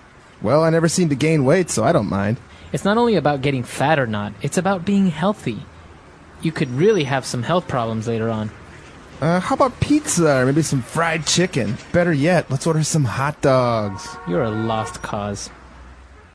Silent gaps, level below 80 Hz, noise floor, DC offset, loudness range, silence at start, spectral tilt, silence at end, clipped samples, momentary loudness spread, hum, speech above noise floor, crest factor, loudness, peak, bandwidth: none; -46 dBFS; -43 dBFS; under 0.1%; 4 LU; 0.4 s; -5.5 dB/octave; 0.3 s; under 0.1%; 10 LU; none; 25 dB; 16 dB; -19 LUFS; -4 dBFS; 11 kHz